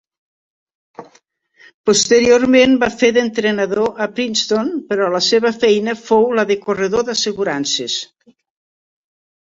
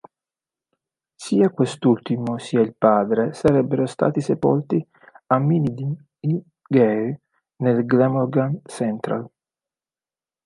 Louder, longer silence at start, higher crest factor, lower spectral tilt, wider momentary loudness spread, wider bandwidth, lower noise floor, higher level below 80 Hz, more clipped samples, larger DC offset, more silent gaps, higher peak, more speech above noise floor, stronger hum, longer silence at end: first, -15 LUFS vs -21 LUFS; second, 1 s vs 1.2 s; about the same, 16 dB vs 18 dB; second, -3 dB/octave vs -8 dB/octave; about the same, 8 LU vs 10 LU; second, 8.2 kHz vs 11.5 kHz; second, -55 dBFS vs under -90 dBFS; about the same, -56 dBFS vs -58 dBFS; neither; neither; first, 1.74-1.84 s vs none; about the same, -2 dBFS vs -2 dBFS; second, 40 dB vs over 70 dB; neither; first, 1.4 s vs 1.2 s